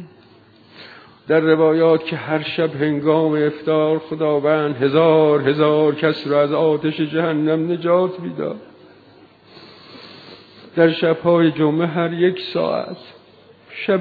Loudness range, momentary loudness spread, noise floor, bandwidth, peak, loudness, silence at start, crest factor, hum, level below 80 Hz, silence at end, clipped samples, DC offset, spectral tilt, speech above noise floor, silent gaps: 6 LU; 12 LU; -49 dBFS; 4.9 kHz; -2 dBFS; -18 LUFS; 0 s; 16 dB; none; -66 dBFS; 0 s; under 0.1%; under 0.1%; -9.5 dB/octave; 32 dB; none